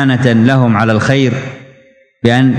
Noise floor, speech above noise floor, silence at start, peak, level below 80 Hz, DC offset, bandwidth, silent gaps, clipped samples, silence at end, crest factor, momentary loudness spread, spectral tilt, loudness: -46 dBFS; 36 dB; 0 s; 0 dBFS; -46 dBFS; under 0.1%; 9.2 kHz; none; 0.5%; 0 s; 12 dB; 9 LU; -7 dB/octave; -11 LUFS